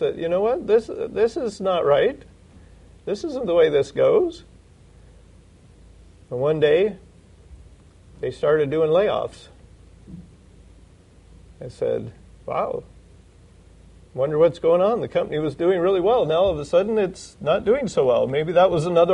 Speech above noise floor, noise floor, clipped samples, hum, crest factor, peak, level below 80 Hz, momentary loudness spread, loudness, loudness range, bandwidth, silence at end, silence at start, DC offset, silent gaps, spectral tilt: 30 dB; -50 dBFS; under 0.1%; none; 18 dB; -4 dBFS; -50 dBFS; 13 LU; -21 LUFS; 11 LU; 10.5 kHz; 0 s; 0 s; under 0.1%; none; -6.5 dB/octave